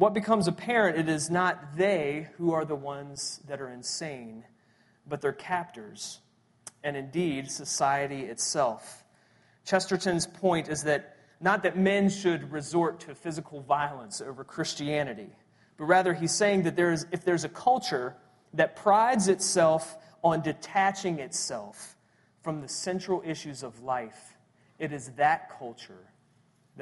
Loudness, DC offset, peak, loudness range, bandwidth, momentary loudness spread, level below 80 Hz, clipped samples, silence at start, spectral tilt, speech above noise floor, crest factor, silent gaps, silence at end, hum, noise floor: -28 LUFS; under 0.1%; -8 dBFS; 9 LU; 11.5 kHz; 15 LU; -68 dBFS; under 0.1%; 0 s; -4 dB/octave; 37 dB; 22 dB; none; 0 s; none; -66 dBFS